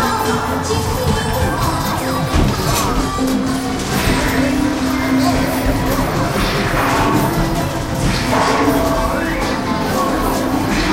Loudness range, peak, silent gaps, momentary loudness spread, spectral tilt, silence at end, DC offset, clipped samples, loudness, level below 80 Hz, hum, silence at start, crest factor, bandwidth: 1 LU; -2 dBFS; none; 4 LU; -5 dB/octave; 0 s; under 0.1%; under 0.1%; -17 LUFS; -26 dBFS; none; 0 s; 14 dB; 16 kHz